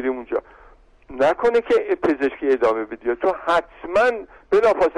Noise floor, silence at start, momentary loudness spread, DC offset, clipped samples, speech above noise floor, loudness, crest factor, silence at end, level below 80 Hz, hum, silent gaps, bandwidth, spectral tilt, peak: -50 dBFS; 0 s; 9 LU; under 0.1%; under 0.1%; 30 dB; -20 LUFS; 12 dB; 0 s; -50 dBFS; none; none; 11 kHz; -5 dB/octave; -8 dBFS